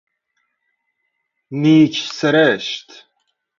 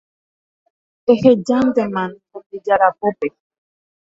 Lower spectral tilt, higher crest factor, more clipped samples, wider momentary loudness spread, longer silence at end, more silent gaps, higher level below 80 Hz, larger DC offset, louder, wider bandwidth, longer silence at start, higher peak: second, -5.5 dB/octave vs -7 dB/octave; about the same, 18 dB vs 18 dB; neither; about the same, 15 LU vs 14 LU; second, 0.75 s vs 0.9 s; second, none vs 2.46-2.50 s; second, -64 dBFS vs -58 dBFS; neither; about the same, -15 LUFS vs -17 LUFS; about the same, 7.4 kHz vs 7.8 kHz; first, 1.5 s vs 1.05 s; about the same, -2 dBFS vs 0 dBFS